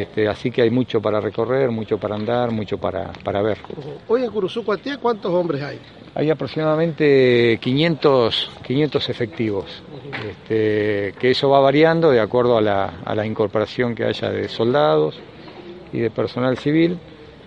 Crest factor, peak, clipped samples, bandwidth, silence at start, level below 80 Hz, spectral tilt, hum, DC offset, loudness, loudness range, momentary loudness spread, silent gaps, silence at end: 18 dB; -2 dBFS; under 0.1%; 8.6 kHz; 0 s; -54 dBFS; -7.5 dB/octave; none; under 0.1%; -19 LUFS; 5 LU; 15 LU; none; 0 s